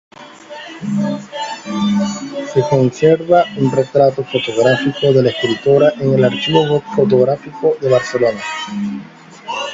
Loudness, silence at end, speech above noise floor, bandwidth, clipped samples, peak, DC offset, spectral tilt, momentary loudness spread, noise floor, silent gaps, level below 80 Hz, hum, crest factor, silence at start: -15 LUFS; 0 s; 20 dB; 7.8 kHz; under 0.1%; 0 dBFS; under 0.1%; -6 dB/octave; 12 LU; -34 dBFS; none; -54 dBFS; none; 14 dB; 0.2 s